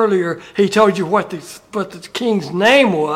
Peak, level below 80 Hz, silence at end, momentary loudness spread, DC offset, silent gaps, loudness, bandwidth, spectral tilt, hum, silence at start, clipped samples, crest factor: 0 dBFS; -58 dBFS; 0 s; 14 LU; under 0.1%; none; -16 LUFS; 16 kHz; -5 dB/octave; none; 0 s; under 0.1%; 16 dB